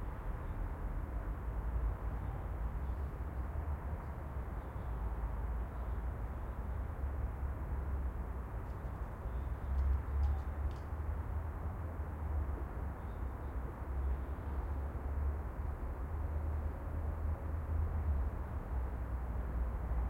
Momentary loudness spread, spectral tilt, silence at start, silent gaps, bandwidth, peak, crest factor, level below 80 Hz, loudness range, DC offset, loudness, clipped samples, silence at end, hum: 6 LU; -9 dB/octave; 0 s; none; 3.7 kHz; -24 dBFS; 14 dB; -40 dBFS; 3 LU; under 0.1%; -41 LUFS; under 0.1%; 0 s; none